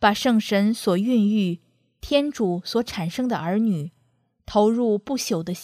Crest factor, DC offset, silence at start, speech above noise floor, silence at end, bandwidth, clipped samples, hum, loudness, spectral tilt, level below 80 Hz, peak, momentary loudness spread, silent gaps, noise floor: 18 dB; under 0.1%; 0 s; 44 dB; 0 s; 15.5 kHz; under 0.1%; none; -22 LUFS; -5.5 dB/octave; -52 dBFS; -4 dBFS; 8 LU; none; -66 dBFS